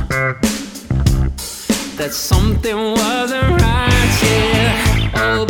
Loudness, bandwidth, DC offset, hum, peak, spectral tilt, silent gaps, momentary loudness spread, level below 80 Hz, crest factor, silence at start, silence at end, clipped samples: -16 LUFS; 20 kHz; under 0.1%; none; 0 dBFS; -4.5 dB/octave; none; 7 LU; -22 dBFS; 14 dB; 0 s; 0 s; under 0.1%